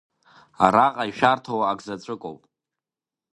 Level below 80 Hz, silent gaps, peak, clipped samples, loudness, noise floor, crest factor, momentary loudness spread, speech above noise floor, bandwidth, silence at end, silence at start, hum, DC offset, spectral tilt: -60 dBFS; none; 0 dBFS; under 0.1%; -21 LUFS; -90 dBFS; 24 dB; 17 LU; 68 dB; 11 kHz; 1 s; 0.6 s; none; under 0.1%; -5.5 dB/octave